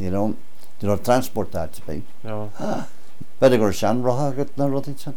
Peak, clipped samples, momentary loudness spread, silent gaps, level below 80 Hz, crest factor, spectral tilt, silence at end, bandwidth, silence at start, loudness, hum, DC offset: -4 dBFS; under 0.1%; 16 LU; none; -50 dBFS; 18 dB; -6.5 dB/octave; 0 s; 19 kHz; 0 s; -23 LUFS; none; 8%